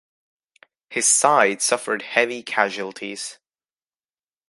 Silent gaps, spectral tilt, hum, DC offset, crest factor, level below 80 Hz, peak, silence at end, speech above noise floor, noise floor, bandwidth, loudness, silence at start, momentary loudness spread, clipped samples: none; -1 dB/octave; none; under 0.1%; 22 dB; -80 dBFS; 0 dBFS; 1.15 s; over 69 dB; under -90 dBFS; 12 kHz; -20 LUFS; 0.9 s; 15 LU; under 0.1%